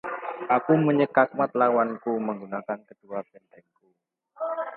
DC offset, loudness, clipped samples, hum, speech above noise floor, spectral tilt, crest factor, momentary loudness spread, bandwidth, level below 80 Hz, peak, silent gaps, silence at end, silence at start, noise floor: under 0.1%; -25 LUFS; under 0.1%; none; 47 dB; -10.5 dB/octave; 22 dB; 15 LU; 4.5 kHz; -76 dBFS; -4 dBFS; none; 0 s; 0.05 s; -72 dBFS